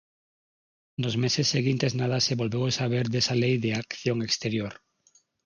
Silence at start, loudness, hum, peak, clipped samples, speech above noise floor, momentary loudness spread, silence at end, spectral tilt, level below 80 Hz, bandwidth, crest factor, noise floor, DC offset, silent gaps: 1 s; -26 LUFS; none; -10 dBFS; under 0.1%; 39 dB; 7 LU; 0.7 s; -4.5 dB/octave; -62 dBFS; 9.6 kHz; 16 dB; -65 dBFS; under 0.1%; none